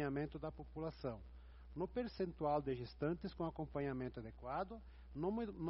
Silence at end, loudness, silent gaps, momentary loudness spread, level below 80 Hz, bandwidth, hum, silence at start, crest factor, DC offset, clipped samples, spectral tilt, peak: 0 s; -44 LUFS; none; 14 LU; -58 dBFS; 5.8 kHz; none; 0 s; 18 dB; under 0.1%; under 0.1%; -7 dB/octave; -26 dBFS